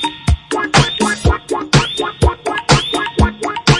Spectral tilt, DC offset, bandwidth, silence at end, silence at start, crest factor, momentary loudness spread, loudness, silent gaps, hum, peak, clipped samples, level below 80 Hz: -4.5 dB/octave; under 0.1%; 11.5 kHz; 0 s; 0 s; 14 dB; 6 LU; -15 LUFS; none; none; 0 dBFS; under 0.1%; -24 dBFS